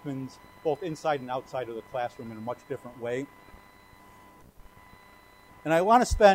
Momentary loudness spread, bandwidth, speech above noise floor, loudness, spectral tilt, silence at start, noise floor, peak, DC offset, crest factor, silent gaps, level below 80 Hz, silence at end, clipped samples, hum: 17 LU; 16 kHz; 28 dB; -29 LUFS; -5 dB/octave; 0.05 s; -55 dBFS; -6 dBFS; under 0.1%; 24 dB; none; -44 dBFS; 0 s; under 0.1%; none